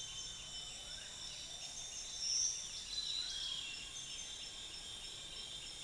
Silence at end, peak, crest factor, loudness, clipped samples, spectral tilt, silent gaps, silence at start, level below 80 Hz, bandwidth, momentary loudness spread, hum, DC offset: 0 s; -26 dBFS; 20 dB; -42 LUFS; under 0.1%; 1 dB/octave; none; 0 s; -64 dBFS; 10.5 kHz; 10 LU; none; under 0.1%